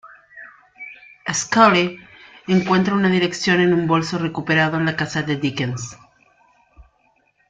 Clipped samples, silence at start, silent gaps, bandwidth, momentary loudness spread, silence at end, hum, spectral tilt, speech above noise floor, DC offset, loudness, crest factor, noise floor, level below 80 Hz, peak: under 0.1%; 0.05 s; none; 9.2 kHz; 22 LU; 0.65 s; none; -5 dB/octave; 44 dB; under 0.1%; -18 LUFS; 18 dB; -62 dBFS; -56 dBFS; -2 dBFS